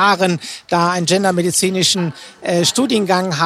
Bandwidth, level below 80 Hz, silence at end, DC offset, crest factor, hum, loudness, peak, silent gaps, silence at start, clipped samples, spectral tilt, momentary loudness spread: 15.5 kHz; -58 dBFS; 0 s; under 0.1%; 16 dB; none; -16 LUFS; 0 dBFS; none; 0 s; under 0.1%; -3.5 dB/octave; 6 LU